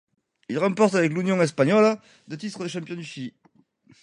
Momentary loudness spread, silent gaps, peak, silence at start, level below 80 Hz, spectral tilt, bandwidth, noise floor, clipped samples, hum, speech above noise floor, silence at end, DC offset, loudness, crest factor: 17 LU; none; -6 dBFS; 0.5 s; -72 dBFS; -6 dB/octave; 11 kHz; -61 dBFS; under 0.1%; none; 38 dB; 0.75 s; under 0.1%; -23 LUFS; 18 dB